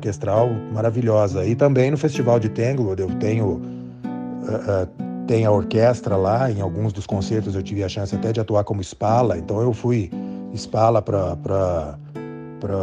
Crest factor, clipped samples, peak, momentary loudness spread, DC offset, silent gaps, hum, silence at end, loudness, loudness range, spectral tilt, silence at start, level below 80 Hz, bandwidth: 16 dB; under 0.1%; -4 dBFS; 12 LU; under 0.1%; none; none; 0 s; -21 LUFS; 3 LU; -7.5 dB/octave; 0 s; -48 dBFS; 9.2 kHz